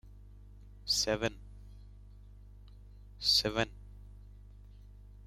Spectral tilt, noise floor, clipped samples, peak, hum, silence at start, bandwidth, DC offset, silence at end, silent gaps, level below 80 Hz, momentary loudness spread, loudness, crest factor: -2.5 dB/octave; -53 dBFS; under 0.1%; -16 dBFS; 50 Hz at -50 dBFS; 0.05 s; 16 kHz; under 0.1%; 0.9 s; none; -52 dBFS; 28 LU; -31 LUFS; 22 dB